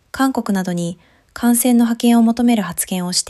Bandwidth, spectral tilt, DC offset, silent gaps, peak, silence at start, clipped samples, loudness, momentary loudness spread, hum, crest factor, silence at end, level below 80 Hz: 15 kHz; -4 dB/octave; under 0.1%; none; -4 dBFS; 0.15 s; under 0.1%; -16 LUFS; 8 LU; none; 12 dB; 0 s; -52 dBFS